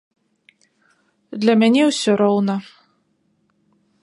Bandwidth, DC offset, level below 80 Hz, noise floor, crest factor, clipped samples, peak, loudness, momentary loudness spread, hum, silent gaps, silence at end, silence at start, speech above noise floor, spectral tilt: 11 kHz; under 0.1%; -74 dBFS; -65 dBFS; 18 dB; under 0.1%; -4 dBFS; -17 LUFS; 11 LU; none; none; 1.4 s; 1.3 s; 49 dB; -5 dB/octave